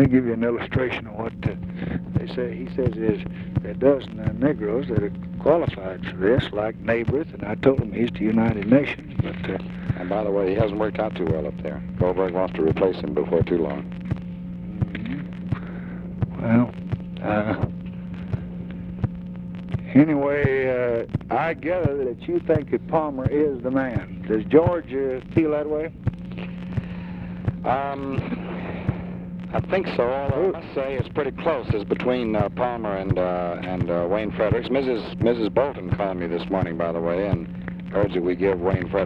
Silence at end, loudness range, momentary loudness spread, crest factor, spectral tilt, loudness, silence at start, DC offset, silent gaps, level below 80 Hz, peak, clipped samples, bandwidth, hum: 0 s; 4 LU; 10 LU; 20 dB; -9.5 dB/octave; -24 LUFS; 0 s; under 0.1%; none; -42 dBFS; -2 dBFS; under 0.1%; 5.8 kHz; none